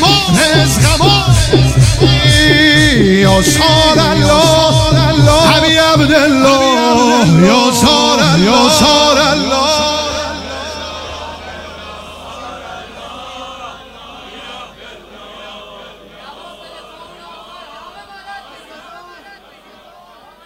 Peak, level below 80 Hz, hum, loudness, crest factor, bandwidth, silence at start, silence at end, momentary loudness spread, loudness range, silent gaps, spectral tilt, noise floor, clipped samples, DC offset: 0 dBFS; -28 dBFS; none; -9 LUFS; 12 dB; 16 kHz; 0 s; 1.45 s; 22 LU; 21 LU; none; -4.5 dB/octave; -41 dBFS; under 0.1%; under 0.1%